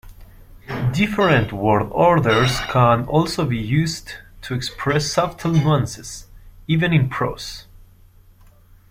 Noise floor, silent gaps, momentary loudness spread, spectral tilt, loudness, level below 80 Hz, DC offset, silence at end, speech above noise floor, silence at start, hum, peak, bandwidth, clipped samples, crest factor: -49 dBFS; none; 17 LU; -6 dB/octave; -19 LUFS; -42 dBFS; under 0.1%; 1.3 s; 30 dB; 0.05 s; none; -2 dBFS; 16 kHz; under 0.1%; 18 dB